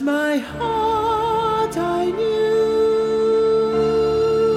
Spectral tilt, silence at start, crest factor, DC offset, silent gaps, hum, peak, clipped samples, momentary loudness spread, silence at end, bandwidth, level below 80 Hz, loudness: -5.5 dB/octave; 0 s; 10 dB; under 0.1%; none; none; -8 dBFS; under 0.1%; 4 LU; 0 s; 13 kHz; -44 dBFS; -19 LUFS